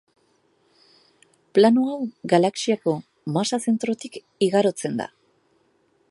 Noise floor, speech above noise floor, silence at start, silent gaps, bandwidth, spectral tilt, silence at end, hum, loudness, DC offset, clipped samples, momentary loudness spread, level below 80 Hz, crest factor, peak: -64 dBFS; 43 dB; 1.55 s; none; 11.5 kHz; -5.5 dB/octave; 1.05 s; none; -22 LUFS; under 0.1%; under 0.1%; 13 LU; -74 dBFS; 20 dB; -2 dBFS